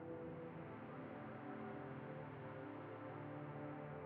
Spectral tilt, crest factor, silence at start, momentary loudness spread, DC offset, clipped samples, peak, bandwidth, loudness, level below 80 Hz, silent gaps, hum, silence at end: -7 dB/octave; 12 dB; 0 s; 2 LU; under 0.1%; under 0.1%; -38 dBFS; 4.8 kHz; -52 LUFS; -80 dBFS; none; none; 0 s